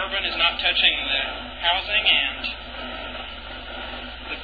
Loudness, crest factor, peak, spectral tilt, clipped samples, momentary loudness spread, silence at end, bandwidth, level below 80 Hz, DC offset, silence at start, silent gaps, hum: -21 LUFS; 20 dB; -4 dBFS; -4.5 dB/octave; under 0.1%; 16 LU; 0 s; 5 kHz; -42 dBFS; 0.4%; 0 s; none; none